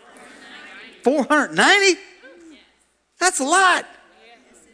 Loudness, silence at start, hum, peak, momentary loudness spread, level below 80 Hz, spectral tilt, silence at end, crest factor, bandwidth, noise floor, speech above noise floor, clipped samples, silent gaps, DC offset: -17 LUFS; 0.55 s; none; 0 dBFS; 25 LU; -68 dBFS; -1.5 dB/octave; 0.9 s; 22 dB; 11 kHz; -62 dBFS; 46 dB; under 0.1%; none; under 0.1%